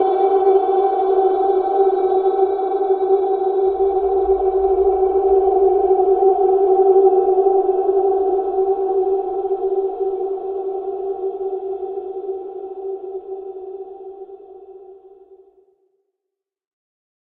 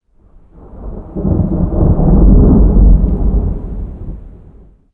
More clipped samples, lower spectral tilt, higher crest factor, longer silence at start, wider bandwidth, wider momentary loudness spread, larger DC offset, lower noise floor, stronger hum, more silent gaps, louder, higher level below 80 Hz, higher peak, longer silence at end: neither; second, -10.5 dB/octave vs -14.5 dB/octave; first, 16 dB vs 10 dB; second, 0 s vs 0.75 s; first, 4.1 kHz vs 1.6 kHz; second, 15 LU vs 21 LU; neither; first, -83 dBFS vs -44 dBFS; neither; neither; second, -17 LUFS vs -12 LUFS; second, -48 dBFS vs -14 dBFS; about the same, -2 dBFS vs 0 dBFS; first, 2.3 s vs 0.65 s